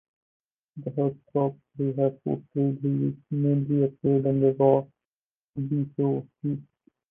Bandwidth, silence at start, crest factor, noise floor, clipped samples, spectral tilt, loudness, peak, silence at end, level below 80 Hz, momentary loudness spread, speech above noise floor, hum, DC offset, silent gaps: 3.4 kHz; 0.75 s; 20 dB; under -90 dBFS; under 0.1%; -13.5 dB/octave; -26 LUFS; -8 dBFS; 0.5 s; -66 dBFS; 11 LU; over 65 dB; none; under 0.1%; 5.05-5.54 s